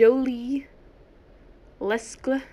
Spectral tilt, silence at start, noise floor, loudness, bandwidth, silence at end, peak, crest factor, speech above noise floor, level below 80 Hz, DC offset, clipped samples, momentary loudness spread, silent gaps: -4.5 dB/octave; 0 s; -52 dBFS; -27 LUFS; 11 kHz; 0.1 s; -6 dBFS; 20 dB; 30 dB; -54 dBFS; under 0.1%; under 0.1%; 8 LU; none